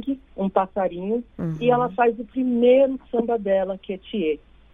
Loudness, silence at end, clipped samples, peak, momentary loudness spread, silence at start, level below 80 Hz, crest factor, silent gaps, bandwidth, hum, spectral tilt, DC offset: -23 LUFS; 0.35 s; under 0.1%; -4 dBFS; 12 LU; 0 s; -52 dBFS; 18 dB; none; 3.8 kHz; none; -9 dB/octave; under 0.1%